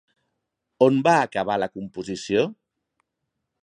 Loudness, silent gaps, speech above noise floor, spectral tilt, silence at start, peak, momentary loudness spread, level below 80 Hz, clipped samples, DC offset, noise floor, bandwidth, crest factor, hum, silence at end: -22 LUFS; none; 59 dB; -5.5 dB/octave; 0.8 s; -4 dBFS; 13 LU; -64 dBFS; under 0.1%; under 0.1%; -80 dBFS; 10.5 kHz; 20 dB; none; 1.1 s